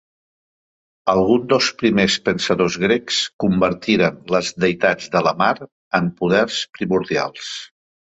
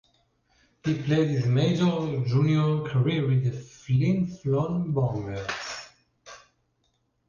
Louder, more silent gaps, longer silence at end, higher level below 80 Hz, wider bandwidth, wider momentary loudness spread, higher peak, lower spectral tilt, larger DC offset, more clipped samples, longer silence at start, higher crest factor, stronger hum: first, -18 LUFS vs -26 LUFS; first, 3.33-3.39 s, 5.72-5.91 s vs none; second, 0.55 s vs 0.9 s; about the same, -52 dBFS vs -56 dBFS; first, 8.2 kHz vs 7.2 kHz; about the same, 7 LU vs 9 LU; first, -2 dBFS vs -12 dBFS; second, -4.5 dB/octave vs -7.5 dB/octave; neither; neither; first, 1.05 s vs 0.85 s; about the same, 18 dB vs 14 dB; neither